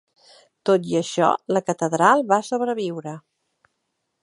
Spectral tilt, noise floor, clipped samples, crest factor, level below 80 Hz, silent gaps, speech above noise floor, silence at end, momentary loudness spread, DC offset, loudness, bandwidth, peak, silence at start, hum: -5 dB/octave; -76 dBFS; under 0.1%; 22 dB; -70 dBFS; none; 56 dB; 1.05 s; 13 LU; under 0.1%; -21 LUFS; 11.5 kHz; -2 dBFS; 0.65 s; none